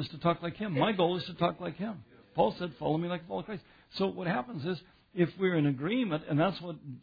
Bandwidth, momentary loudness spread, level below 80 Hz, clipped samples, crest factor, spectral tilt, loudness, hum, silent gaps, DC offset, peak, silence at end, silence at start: 5 kHz; 12 LU; -64 dBFS; under 0.1%; 18 dB; -9 dB/octave; -32 LUFS; none; none; under 0.1%; -14 dBFS; 0 s; 0 s